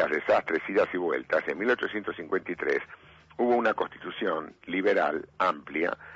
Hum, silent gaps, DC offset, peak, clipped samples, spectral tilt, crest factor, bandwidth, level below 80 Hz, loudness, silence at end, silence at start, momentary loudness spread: none; none; under 0.1%; -14 dBFS; under 0.1%; -6 dB/octave; 14 dB; 7.8 kHz; -66 dBFS; -28 LUFS; 0 s; 0 s; 8 LU